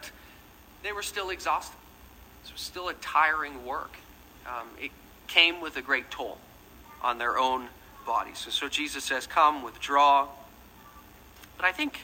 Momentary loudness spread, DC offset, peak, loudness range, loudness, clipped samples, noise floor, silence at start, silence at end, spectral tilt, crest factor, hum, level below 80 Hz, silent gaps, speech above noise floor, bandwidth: 20 LU; under 0.1%; -4 dBFS; 5 LU; -27 LUFS; under 0.1%; -53 dBFS; 0 s; 0 s; -1.5 dB/octave; 26 dB; none; -58 dBFS; none; 25 dB; 16 kHz